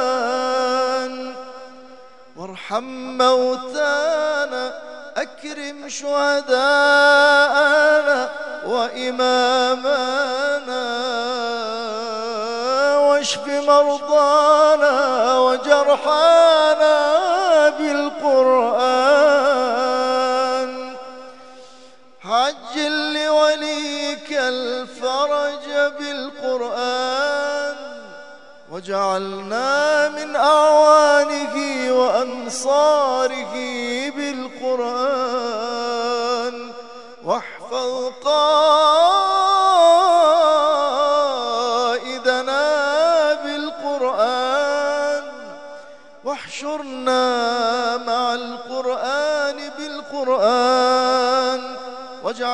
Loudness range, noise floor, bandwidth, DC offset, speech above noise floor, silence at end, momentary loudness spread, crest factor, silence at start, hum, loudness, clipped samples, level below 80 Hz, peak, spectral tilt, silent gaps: 8 LU; -47 dBFS; 11 kHz; 0.4%; 30 dB; 0 s; 15 LU; 18 dB; 0 s; none; -18 LUFS; under 0.1%; -70 dBFS; 0 dBFS; -2 dB/octave; none